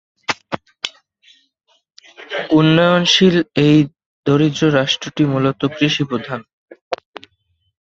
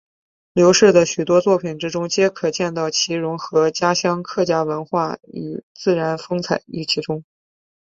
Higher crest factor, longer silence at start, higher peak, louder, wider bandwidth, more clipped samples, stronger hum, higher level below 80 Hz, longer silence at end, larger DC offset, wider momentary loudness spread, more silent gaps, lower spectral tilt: about the same, 16 dB vs 18 dB; second, 0.3 s vs 0.55 s; about the same, 0 dBFS vs -2 dBFS; first, -16 LUFS vs -19 LUFS; about the same, 7.8 kHz vs 7.8 kHz; neither; neither; first, -54 dBFS vs -60 dBFS; first, 0.9 s vs 0.7 s; neither; first, 16 LU vs 11 LU; first, 4.06-4.23 s, 6.53-6.68 s, 6.81-6.91 s vs 5.63-5.75 s; first, -5.5 dB/octave vs -4 dB/octave